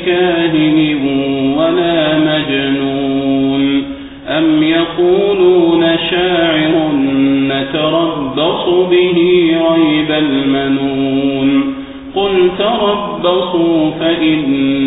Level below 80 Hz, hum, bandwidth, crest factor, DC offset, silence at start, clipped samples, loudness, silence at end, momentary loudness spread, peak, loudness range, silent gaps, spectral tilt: -42 dBFS; none; 4 kHz; 12 dB; under 0.1%; 0 s; under 0.1%; -12 LUFS; 0 s; 5 LU; 0 dBFS; 2 LU; none; -11.5 dB/octave